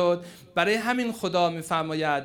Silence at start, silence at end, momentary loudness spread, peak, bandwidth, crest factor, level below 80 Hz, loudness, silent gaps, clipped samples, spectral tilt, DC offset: 0 s; 0 s; 5 LU; -8 dBFS; over 20 kHz; 18 dB; -66 dBFS; -26 LUFS; none; under 0.1%; -5 dB/octave; under 0.1%